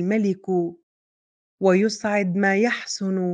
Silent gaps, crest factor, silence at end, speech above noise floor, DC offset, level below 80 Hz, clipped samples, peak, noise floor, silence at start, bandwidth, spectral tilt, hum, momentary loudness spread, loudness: 0.83-1.58 s; 16 dB; 0 s; over 69 dB; under 0.1%; -72 dBFS; under 0.1%; -6 dBFS; under -90 dBFS; 0 s; 9.4 kHz; -5.5 dB/octave; none; 6 LU; -22 LUFS